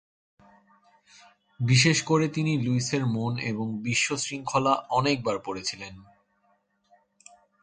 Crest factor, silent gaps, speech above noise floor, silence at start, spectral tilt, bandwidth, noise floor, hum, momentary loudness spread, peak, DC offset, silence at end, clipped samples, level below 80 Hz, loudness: 20 dB; none; 43 dB; 1.6 s; -4.5 dB/octave; 9.4 kHz; -69 dBFS; none; 11 LU; -8 dBFS; under 0.1%; 1.6 s; under 0.1%; -62 dBFS; -26 LUFS